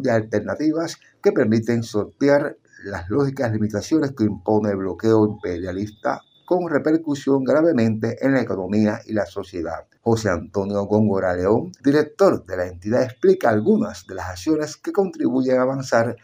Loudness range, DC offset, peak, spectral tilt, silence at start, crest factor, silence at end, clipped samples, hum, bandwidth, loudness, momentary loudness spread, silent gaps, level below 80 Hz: 2 LU; under 0.1%; -2 dBFS; -7 dB/octave; 0 s; 18 dB; 0.1 s; under 0.1%; none; 16 kHz; -21 LUFS; 10 LU; none; -58 dBFS